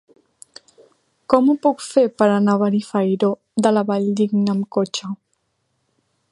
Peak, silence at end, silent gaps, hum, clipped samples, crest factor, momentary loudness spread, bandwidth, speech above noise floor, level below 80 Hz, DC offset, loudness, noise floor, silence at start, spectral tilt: 0 dBFS; 1.15 s; none; none; under 0.1%; 20 dB; 6 LU; 11.5 kHz; 52 dB; -66 dBFS; under 0.1%; -19 LUFS; -70 dBFS; 1.3 s; -6.5 dB/octave